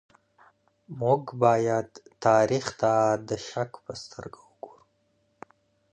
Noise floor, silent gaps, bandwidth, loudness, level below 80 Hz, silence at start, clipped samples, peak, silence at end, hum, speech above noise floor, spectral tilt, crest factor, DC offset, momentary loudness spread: -70 dBFS; none; 9.6 kHz; -25 LUFS; -64 dBFS; 0.9 s; under 0.1%; -8 dBFS; 1.25 s; none; 45 dB; -5.5 dB/octave; 20 dB; under 0.1%; 23 LU